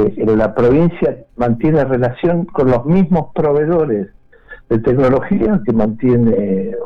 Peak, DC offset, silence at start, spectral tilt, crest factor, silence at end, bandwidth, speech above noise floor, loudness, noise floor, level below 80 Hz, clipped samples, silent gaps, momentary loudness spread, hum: -6 dBFS; under 0.1%; 0 s; -10.5 dB/octave; 8 dB; 0 s; 6 kHz; 26 dB; -15 LUFS; -39 dBFS; -36 dBFS; under 0.1%; none; 6 LU; none